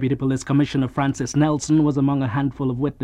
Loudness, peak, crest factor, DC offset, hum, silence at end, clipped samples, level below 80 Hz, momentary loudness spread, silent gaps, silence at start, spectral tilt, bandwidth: -21 LUFS; -6 dBFS; 14 dB; under 0.1%; none; 0 s; under 0.1%; -46 dBFS; 5 LU; none; 0 s; -6.5 dB/octave; 10.5 kHz